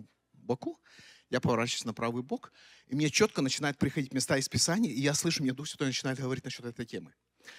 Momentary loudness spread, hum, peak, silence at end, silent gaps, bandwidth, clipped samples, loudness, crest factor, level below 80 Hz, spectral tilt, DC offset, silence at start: 13 LU; none; -12 dBFS; 0 s; none; 16 kHz; under 0.1%; -31 LUFS; 20 dB; -66 dBFS; -4 dB/octave; under 0.1%; 0 s